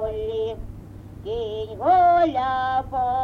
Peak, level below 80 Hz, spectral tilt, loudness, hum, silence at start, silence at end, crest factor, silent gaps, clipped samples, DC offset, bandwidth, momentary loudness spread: -8 dBFS; -42 dBFS; -7 dB/octave; -22 LUFS; none; 0 s; 0 s; 14 dB; none; under 0.1%; under 0.1%; 6.4 kHz; 21 LU